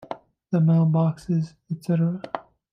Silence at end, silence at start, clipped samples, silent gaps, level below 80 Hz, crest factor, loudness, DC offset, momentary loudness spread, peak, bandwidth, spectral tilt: 0.3 s; 0 s; under 0.1%; none; -64 dBFS; 14 dB; -23 LUFS; under 0.1%; 17 LU; -10 dBFS; 6 kHz; -9.5 dB/octave